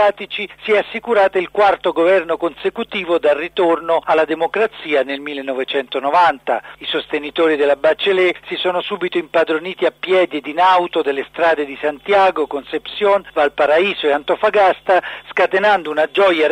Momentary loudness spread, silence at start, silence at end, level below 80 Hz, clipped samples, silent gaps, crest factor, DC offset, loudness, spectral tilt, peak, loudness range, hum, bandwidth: 8 LU; 0 s; 0 s; -56 dBFS; under 0.1%; none; 12 dB; under 0.1%; -16 LUFS; -5 dB/octave; -6 dBFS; 2 LU; none; 10 kHz